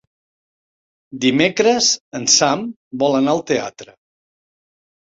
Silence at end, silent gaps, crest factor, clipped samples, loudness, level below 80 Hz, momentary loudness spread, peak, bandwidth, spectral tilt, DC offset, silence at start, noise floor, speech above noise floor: 1.25 s; 2.01-2.11 s, 2.76-2.91 s; 18 dB; under 0.1%; -16 LUFS; -60 dBFS; 11 LU; 0 dBFS; 7.8 kHz; -2.5 dB/octave; under 0.1%; 1.1 s; under -90 dBFS; over 73 dB